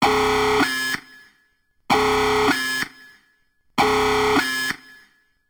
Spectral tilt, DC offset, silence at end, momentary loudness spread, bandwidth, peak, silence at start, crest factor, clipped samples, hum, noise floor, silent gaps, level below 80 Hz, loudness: -3 dB/octave; under 0.1%; 0.75 s; 9 LU; over 20 kHz; -6 dBFS; 0 s; 16 dB; under 0.1%; none; -64 dBFS; none; -46 dBFS; -20 LUFS